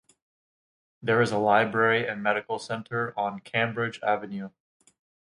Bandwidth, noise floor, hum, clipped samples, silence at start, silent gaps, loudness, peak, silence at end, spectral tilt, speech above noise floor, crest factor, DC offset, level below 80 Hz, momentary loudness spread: 11 kHz; under -90 dBFS; none; under 0.1%; 1 s; none; -26 LUFS; -6 dBFS; 0.8 s; -5.5 dB/octave; over 64 dB; 20 dB; under 0.1%; -70 dBFS; 11 LU